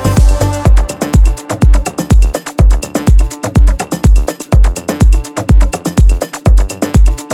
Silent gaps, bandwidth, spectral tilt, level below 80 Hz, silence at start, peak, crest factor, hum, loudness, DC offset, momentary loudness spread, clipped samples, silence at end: none; 13 kHz; -6 dB/octave; -10 dBFS; 0 s; 0 dBFS; 8 dB; none; -12 LUFS; under 0.1%; 3 LU; under 0.1%; 0 s